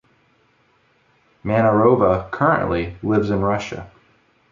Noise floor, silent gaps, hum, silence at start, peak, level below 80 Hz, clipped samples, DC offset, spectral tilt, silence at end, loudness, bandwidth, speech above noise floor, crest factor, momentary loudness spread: -60 dBFS; none; none; 1.45 s; -2 dBFS; -44 dBFS; under 0.1%; under 0.1%; -8 dB/octave; 0.65 s; -18 LUFS; 7.4 kHz; 42 dB; 18 dB; 13 LU